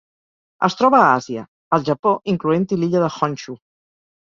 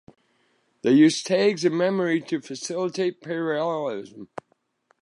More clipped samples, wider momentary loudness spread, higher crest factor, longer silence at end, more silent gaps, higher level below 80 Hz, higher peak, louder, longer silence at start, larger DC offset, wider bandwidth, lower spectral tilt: neither; about the same, 17 LU vs 19 LU; about the same, 18 dB vs 18 dB; about the same, 0.7 s vs 0.8 s; first, 1.48-1.71 s, 1.99-2.03 s vs none; first, -60 dBFS vs -76 dBFS; first, -2 dBFS vs -6 dBFS; first, -18 LUFS vs -23 LUFS; second, 0.6 s vs 0.85 s; neither; second, 7.6 kHz vs 11.5 kHz; first, -6.5 dB/octave vs -5 dB/octave